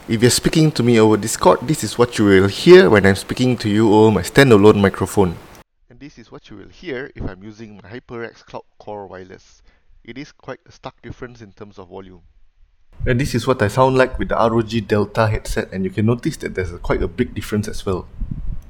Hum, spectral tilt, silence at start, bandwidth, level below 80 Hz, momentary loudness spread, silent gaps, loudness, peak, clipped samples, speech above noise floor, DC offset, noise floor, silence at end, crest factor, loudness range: none; -5.5 dB/octave; 0.1 s; 18 kHz; -36 dBFS; 23 LU; none; -16 LUFS; 0 dBFS; under 0.1%; 33 dB; under 0.1%; -50 dBFS; 0.1 s; 18 dB; 23 LU